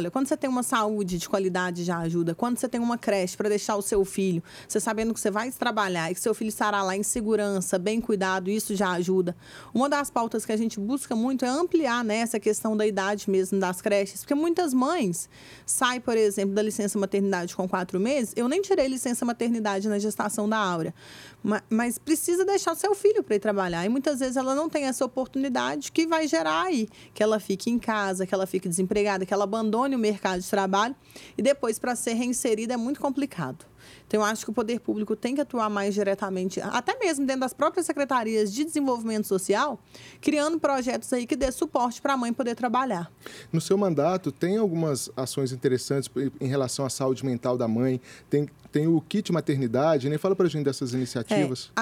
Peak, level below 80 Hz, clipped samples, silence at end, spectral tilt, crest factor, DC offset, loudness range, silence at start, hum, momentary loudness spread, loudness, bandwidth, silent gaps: -10 dBFS; -58 dBFS; under 0.1%; 0 s; -5 dB/octave; 16 dB; under 0.1%; 2 LU; 0 s; none; 5 LU; -26 LUFS; 17 kHz; none